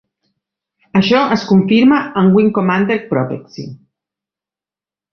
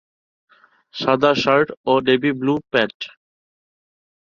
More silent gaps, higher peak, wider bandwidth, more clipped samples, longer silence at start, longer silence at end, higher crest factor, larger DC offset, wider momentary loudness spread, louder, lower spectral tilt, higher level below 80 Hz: second, none vs 1.77-1.84 s, 2.94-3.00 s; about the same, -2 dBFS vs -2 dBFS; second, 6.4 kHz vs 7.2 kHz; neither; about the same, 0.95 s vs 0.95 s; first, 1.4 s vs 1.25 s; second, 14 dB vs 20 dB; neither; about the same, 16 LU vs 14 LU; first, -13 LUFS vs -18 LUFS; first, -7.5 dB/octave vs -5.5 dB/octave; first, -54 dBFS vs -60 dBFS